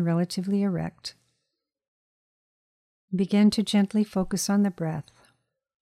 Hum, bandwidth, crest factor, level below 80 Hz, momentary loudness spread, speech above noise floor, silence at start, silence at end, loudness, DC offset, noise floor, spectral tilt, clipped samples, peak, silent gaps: none; 14.5 kHz; 16 dB; -58 dBFS; 13 LU; 58 dB; 0 s; 0.8 s; -25 LUFS; under 0.1%; -82 dBFS; -6 dB/octave; under 0.1%; -12 dBFS; 1.88-3.08 s